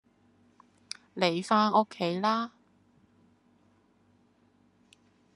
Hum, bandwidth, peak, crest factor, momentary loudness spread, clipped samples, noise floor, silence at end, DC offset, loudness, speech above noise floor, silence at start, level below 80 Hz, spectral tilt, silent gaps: none; 12 kHz; -8 dBFS; 24 dB; 18 LU; under 0.1%; -66 dBFS; 2.9 s; under 0.1%; -28 LUFS; 39 dB; 1.15 s; -80 dBFS; -5 dB/octave; none